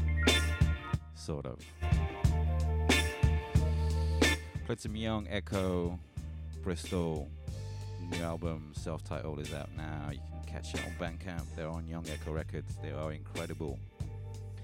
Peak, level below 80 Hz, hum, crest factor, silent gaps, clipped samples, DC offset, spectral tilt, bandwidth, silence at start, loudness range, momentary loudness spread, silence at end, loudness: -12 dBFS; -38 dBFS; none; 22 dB; none; under 0.1%; under 0.1%; -5 dB/octave; 16.5 kHz; 0 s; 9 LU; 14 LU; 0 s; -35 LUFS